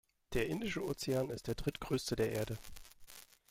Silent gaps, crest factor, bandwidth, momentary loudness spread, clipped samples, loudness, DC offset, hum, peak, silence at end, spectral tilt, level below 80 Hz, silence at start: none; 18 dB; 16.5 kHz; 19 LU; under 0.1%; -38 LUFS; under 0.1%; none; -22 dBFS; 0.25 s; -5 dB/octave; -54 dBFS; 0.3 s